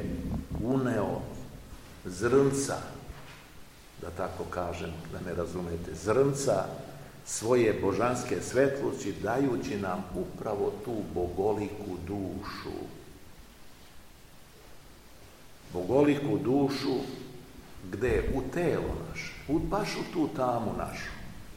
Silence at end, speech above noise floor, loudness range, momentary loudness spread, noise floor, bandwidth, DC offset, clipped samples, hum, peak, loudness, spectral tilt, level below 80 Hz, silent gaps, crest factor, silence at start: 0 s; 22 dB; 8 LU; 19 LU; -52 dBFS; 16.5 kHz; 0.1%; under 0.1%; none; -12 dBFS; -31 LUFS; -5.5 dB/octave; -48 dBFS; none; 20 dB; 0 s